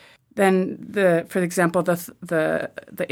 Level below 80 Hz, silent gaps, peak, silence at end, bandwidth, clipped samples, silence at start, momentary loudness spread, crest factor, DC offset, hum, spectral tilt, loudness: -66 dBFS; none; -6 dBFS; 0.05 s; 17.5 kHz; under 0.1%; 0.35 s; 9 LU; 18 dB; under 0.1%; none; -6 dB/octave; -22 LUFS